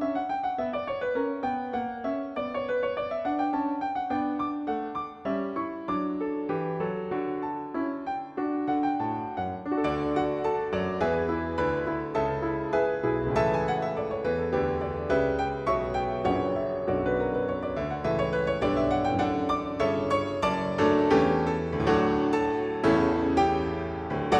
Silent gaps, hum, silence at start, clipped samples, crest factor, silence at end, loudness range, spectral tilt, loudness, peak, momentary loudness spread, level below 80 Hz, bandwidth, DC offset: none; none; 0 s; under 0.1%; 18 dB; 0 s; 6 LU; -7.5 dB/octave; -28 LUFS; -10 dBFS; 7 LU; -48 dBFS; 9.2 kHz; under 0.1%